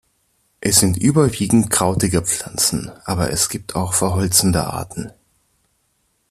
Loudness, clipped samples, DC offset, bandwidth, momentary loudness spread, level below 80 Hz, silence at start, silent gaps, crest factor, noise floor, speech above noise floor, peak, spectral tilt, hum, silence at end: -17 LUFS; under 0.1%; under 0.1%; 14.5 kHz; 11 LU; -44 dBFS; 0.6 s; none; 20 dB; -66 dBFS; 48 dB; 0 dBFS; -4 dB/octave; none; 1.2 s